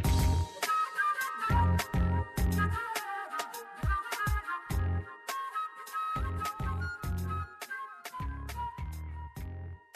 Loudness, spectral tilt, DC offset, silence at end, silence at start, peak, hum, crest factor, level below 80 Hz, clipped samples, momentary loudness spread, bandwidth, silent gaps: -34 LUFS; -5 dB/octave; under 0.1%; 0.15 s; 0 s; -18 dBFS; none; 14 dB; -38 dBFS; under 0.1%; 12 LU; 14.5 kHz; none